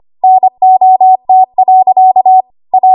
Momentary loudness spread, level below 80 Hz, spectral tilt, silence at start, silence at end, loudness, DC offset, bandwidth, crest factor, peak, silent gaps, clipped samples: 4 LU; -64 dBFS; -9.5 dB/octave; 0.25 s; 0 s; -7 LUFS; under 0.1%; 1.1 kHz; 6 dB; 0 dBFS; none; under 0.1%